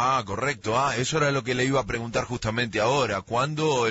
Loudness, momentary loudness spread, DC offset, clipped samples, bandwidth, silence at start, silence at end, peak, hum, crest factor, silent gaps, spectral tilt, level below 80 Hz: -25 LUFS; 5 LU; under 0.1%; under 0.1%; 8 kHz; 0 s; 0 s; -12 dBFS; none; 14 dB; none; -4.5 dB/octave; -50 dBFS